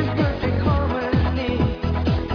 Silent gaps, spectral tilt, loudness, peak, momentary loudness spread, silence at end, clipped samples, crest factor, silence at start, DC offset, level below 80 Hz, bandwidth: none; -8.5 dB/octave; -22 LUFS; -8 dBFS; 2 LU; 0 s; under 0.1%; 12 dB; 0 s; under 0.1%; -28 dBFS; 5.4 kHz